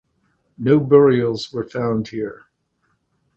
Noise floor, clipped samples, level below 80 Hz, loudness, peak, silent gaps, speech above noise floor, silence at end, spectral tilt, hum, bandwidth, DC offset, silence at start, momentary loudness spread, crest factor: -68 dBFS; under 0.1%; -56 dBFS; -18 LUFS; 0 dBFS; none; 51 dB; 1.05 s; -8 dB/octave; none; 7.6 kHz; under 0.1%; 0.6 s; 15 LU; 20 dB